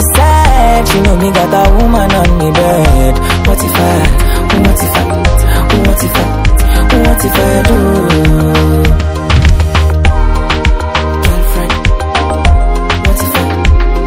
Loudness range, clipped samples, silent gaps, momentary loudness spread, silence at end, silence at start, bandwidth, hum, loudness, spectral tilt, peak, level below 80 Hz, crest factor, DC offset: 3 LU; 1%; none; 4 LU; 0 s; 0 s; 16.5 kHz; none; -10 LUFS; -5.5 dB/octave; 0 dBFS; -10 dBFS; 8 dB; under 0.1%